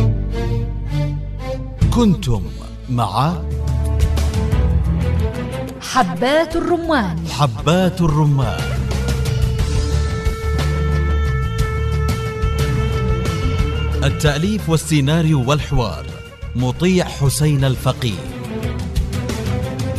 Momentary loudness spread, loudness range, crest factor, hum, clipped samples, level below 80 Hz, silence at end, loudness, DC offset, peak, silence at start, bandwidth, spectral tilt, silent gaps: 8 LU; 2 LU; 16 dB; none; under 0.1%; -24 dBFS; 0 s; -19 LUFS; under 0.1%; -2 dBFS; 0 s; 14 kHz; -6 dB/octave; none